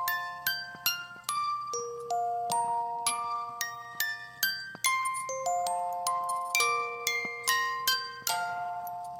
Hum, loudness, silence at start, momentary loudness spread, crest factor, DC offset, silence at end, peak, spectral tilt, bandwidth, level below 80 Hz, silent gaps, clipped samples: none; -31 LUFS; 0 s; 7 LU; 24 dB; under 0.1%; 0 s; -8 dBFS; 0.5 dB/octave; 17 kHz; -76 dBFS; none; under 0.1%